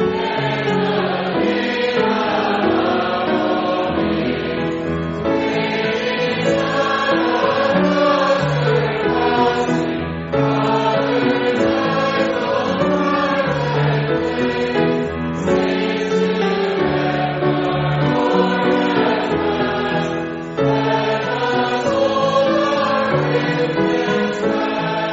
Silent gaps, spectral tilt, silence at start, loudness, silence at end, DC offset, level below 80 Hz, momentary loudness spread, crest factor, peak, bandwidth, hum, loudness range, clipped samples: none; -4.5 dB/octave; 0 s; -18 LUFS; 0 s; under 0.1%; -46 dBFS; 4 LU; 14 dB; -2 dBFS; 8 kHz; none; 2 LU; under 0.1%